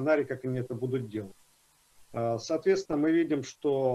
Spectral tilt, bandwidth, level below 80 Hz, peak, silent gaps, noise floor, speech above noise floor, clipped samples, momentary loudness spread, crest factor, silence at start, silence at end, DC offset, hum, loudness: -6.5 dB/octave; 12.5 kHz; -66 dBFS; -14 dBFS; none; -65 dBFS; 36 dB; under 0.1%; 12 LU; 16 dB; 0 s; 0 s; under 0.1%; none; -30 LUFS